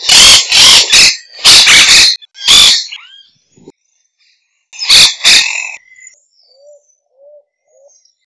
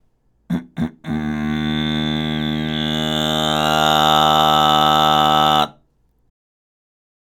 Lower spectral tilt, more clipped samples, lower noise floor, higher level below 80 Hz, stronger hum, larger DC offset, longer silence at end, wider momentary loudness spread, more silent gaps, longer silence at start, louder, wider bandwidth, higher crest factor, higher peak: second, 2 dB/octave vs -4.5 dB/octave; first, 4% vs under 0.1%; about the same, -60 dBFS vs -60 dBFS; about the same, -40 dBFS vs -42 dBFS; neither; neither; first, 2.5 s vs 1.55 s; about the same, 13 LU vs 11 LU; neither; second, 0 s vs 0.5 s; first, -3 LUFS vs -17 LUFS; second, 11 kHz vs 19 kHz; second, 10 dB vs 18 dB; about the same, 0 dBFS vs -2 dBFS